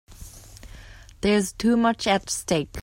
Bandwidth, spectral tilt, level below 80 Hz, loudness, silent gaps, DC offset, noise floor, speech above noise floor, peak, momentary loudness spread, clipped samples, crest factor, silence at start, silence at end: 16.5 kHz; -4 dB/octave; -46 dBFS; -23 LUFS; none; under 0.1%; -45 dBFS; 22 dB; -6 dBFS; 23 LU; under 0.1%; 18 dB; 0.1 s; 0 s